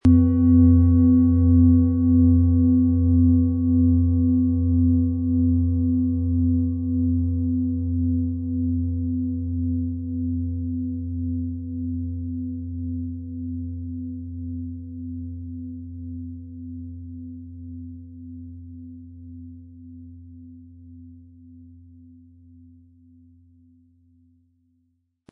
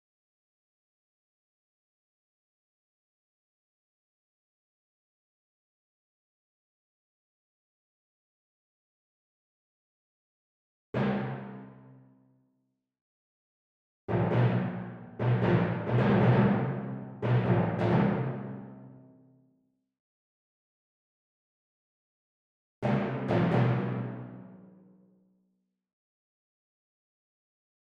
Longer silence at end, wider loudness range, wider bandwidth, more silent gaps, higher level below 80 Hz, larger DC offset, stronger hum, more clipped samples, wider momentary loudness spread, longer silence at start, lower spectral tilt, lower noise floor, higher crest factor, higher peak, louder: first, 3.7 s vs 3.4 s; first, 23 LU vs 12 LU; second, 1.6 kHz vs 5.4 kHz; second, none vs 13.01-14.08 s, 20.00-22.82 s; first, -42 dBFS vs -62 dBFS; neither; neither; neither; first, 22 LU vs 18 LU; second, 0.05 s vs 10.95 s; first, -13 dB/octave vs -10 dB/octave; second, -70 dBFS vs -78 dBFS; second, 16 dB vs 22 dB; first, -6 dBFS vs -12 dBFS; first, -21 LUFS vs -29 LUFS